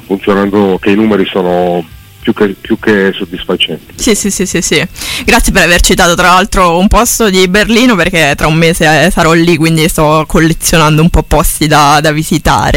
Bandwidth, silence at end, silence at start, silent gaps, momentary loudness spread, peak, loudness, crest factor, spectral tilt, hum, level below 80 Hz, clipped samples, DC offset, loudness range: 17 kHz; 0 s; 0.1 s; none; 7 LU; 0 dBFS; -8 LUFS; 8 dB; -4 dB/octave; none; -20 dBFS; 0.3%; under 0.1%; 5 LU